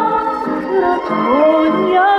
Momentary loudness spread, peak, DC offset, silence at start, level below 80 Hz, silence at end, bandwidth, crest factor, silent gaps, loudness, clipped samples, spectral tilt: 6 LU; -2 dBFS; under 0.1%; 0 s; -50 dBFS; 0 s; 8.2 kHz; 12 dB; none; -14 LUFS; under 0.1%; -7 dB/octave